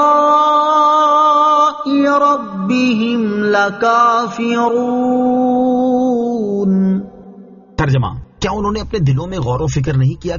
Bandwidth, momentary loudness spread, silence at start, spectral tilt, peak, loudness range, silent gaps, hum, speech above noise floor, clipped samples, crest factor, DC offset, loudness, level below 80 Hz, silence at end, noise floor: 7.2 kHz; 8 LU; 0 s; -6 dB/octave; 0 dBFS; 6 LU; none; none; 24 dB; under 0.1%; 12 dB; under 0.1%; -14 LUFS; -38 dBFS; 0 s; -38 dBFS